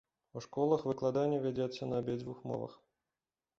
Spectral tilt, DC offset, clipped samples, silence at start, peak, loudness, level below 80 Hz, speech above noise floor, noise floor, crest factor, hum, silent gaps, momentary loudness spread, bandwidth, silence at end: -7 dB/octave; under 0.1%; under 0.1%; 0.35 s; -16 dBFS; -36 LUFS; -70 dBFS; over 55 dB; under -90 dBFS; 20 dB; none; none; 13 LU; 7.6 kHz; 0.85 s